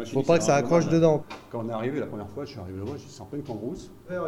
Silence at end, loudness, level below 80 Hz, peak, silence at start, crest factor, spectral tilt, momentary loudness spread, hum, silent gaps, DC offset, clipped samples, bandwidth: 0 s; -26 LUFS; -58 dBFS; -8 dBFS; 0 s; 18 dB; -6 dB/octave; 16 LU; none; none; under 0.1%; under 0.1%; 13 kHz